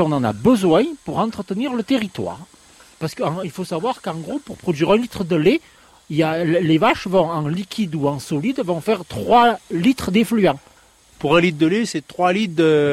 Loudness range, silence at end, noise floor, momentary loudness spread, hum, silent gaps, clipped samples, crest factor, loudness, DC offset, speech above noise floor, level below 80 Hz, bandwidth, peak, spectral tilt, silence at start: 6 LU; 0 s; -51 dBFS; 11 LU; none; none; under 0.1%; 16 dB; -19 LUFS; under 0.1%; 33 dB; -50 dBFS; 15 kHz; -4 dBFS; -6 dB/octave; 0 s